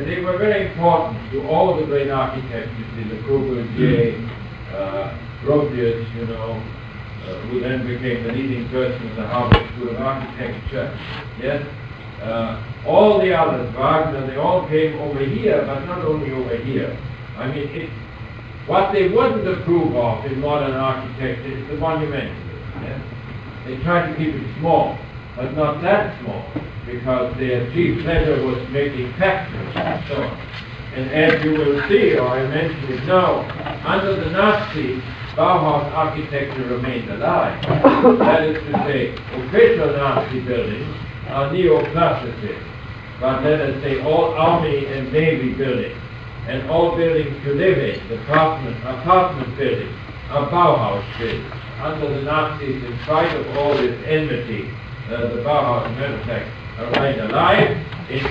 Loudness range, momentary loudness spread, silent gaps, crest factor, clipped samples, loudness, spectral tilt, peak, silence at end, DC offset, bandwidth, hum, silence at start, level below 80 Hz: 6 LU; 14 LU; none; 18 dB; under 0.1%; -19 LUFS; -8.5 dB/octave; 0 dBFS; 0 s; under 0.1%; 7.4 kHz; none; 0 s; -38 dBFS